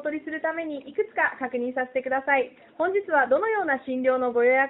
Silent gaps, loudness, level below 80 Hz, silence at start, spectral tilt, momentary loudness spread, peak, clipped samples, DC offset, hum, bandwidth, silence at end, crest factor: none; -25 LUFS; -70 dBFS; 0 s; -2 dB/octave; 8 LU; -8 dBFS; under 0.1%; under 0.1%; none; 4 kHz; 0 s; 16 dB